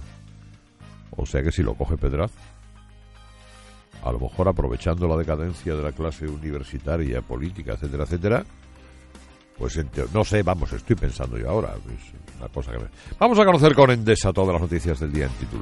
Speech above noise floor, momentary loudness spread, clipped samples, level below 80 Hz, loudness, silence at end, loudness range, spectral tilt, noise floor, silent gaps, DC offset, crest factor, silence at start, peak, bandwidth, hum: 25 dB; 17 LU; under 0.1%; -34 dBFS; -23 LUFS; 0 s; 9 LU; -6.5 dB/octave; -48 dBFS; none; under 0.1%; 22 dB; 0 s; -2 dBFS; 11.5 kHz; none